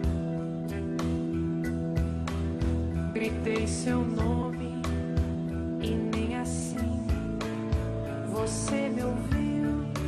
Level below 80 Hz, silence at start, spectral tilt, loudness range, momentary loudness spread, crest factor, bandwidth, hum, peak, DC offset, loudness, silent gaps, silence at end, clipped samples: -38 dBFS; 0 s; -6.5 dB/octave; 1 LU; 4 LU; 14 dB; 13.5 kHz; none; -16 dBFS; under 0.1%; -30 LUFS; none; 0 s; under 0.1%